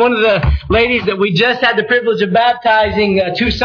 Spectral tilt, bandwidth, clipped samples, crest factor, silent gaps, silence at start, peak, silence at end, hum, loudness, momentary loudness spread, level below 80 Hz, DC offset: -6.5 dB/octave; 5.4 kHz; under 0.1%; 10 dB; none; 0 s; -2 dBFS; 0 s; none; -13 LUFS; 3 LU; -26 dBFS; under 0.1%